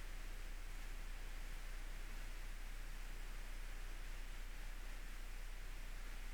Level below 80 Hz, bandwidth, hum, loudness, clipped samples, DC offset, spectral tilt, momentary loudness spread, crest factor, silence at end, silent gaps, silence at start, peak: -48 dBFS; 20 kHz; none; -54 LUFS; under 0.1%; 0.2%; -3 dB/octave; 1 LU; 8 dB; 0 s; none; 0 s; -38 dBFS